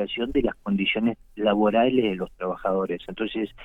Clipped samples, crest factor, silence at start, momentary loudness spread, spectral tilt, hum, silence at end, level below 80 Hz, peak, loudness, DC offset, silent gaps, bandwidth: under 0.1%; 16 dB; 0 s; 10 LU; -8 dB/octave; none; 0 s; -46 dBFS; -8 dBFS; -25 LUFS; under 0.1%; none; 4.1 kHz